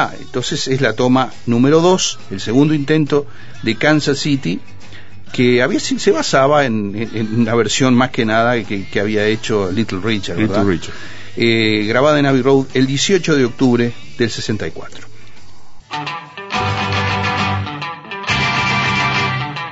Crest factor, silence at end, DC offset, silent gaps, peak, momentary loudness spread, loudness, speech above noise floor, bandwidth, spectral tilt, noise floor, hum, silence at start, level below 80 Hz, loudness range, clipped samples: 16 dB; 0 s; 4%; none; 0 dBFS; 11 LU; -16 LUFS; 29 dB; 8 kHz; -5 dB/octave; -44 dBFS; none; 0 s; -46 dBFS; 6 LU; under 0.1%